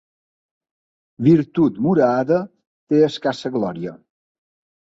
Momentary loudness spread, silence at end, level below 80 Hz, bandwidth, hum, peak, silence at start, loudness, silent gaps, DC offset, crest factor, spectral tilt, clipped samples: 11 LU; 0.95 s; -58 dBFS; 7.8 kHz; none; -2 dBFS; 1.2 s; -19 LUFS; 2.67-2.87 s; under 0.1%; 18 dB; -8 dB/octave; under 0.1%